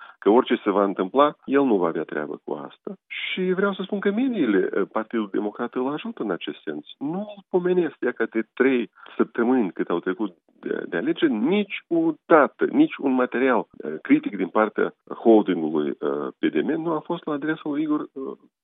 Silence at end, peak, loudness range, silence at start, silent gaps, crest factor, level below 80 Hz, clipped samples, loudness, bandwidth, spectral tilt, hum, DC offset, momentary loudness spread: 0.3 s; -2 dBFS; 5 LU; 0 s; none; 22 dB; -84 dBFS; under 0.1%; -23 LUFS; 4 kHz; -10.5 dB/octave; none; under 0.1%; 12 LU